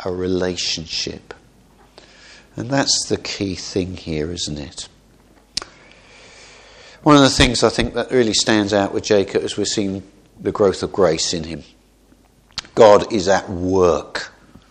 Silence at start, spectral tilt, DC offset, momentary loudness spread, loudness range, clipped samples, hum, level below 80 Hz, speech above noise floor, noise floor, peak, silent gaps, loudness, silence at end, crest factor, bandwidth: 0 s; -4 dB/octave; under 0.1%; 19 LU; 8 LU; under 0.1%; none; -40 dBFS; 35 dB; -53 dBFS; 0 dBFS; none; -18 LUFS; 0.4 s; 20 dB; 12 kHz